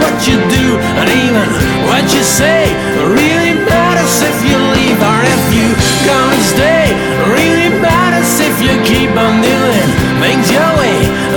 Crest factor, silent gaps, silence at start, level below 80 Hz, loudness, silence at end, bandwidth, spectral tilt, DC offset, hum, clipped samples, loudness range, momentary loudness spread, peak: 10 dB; none; 0 s; -28 dBFS; -9 LUFS; 0 s; 18 kHz; -4.5 dB/octave; under 0.1%; none; under 0.1%; 0 LU; 2 LU; 0 dBFS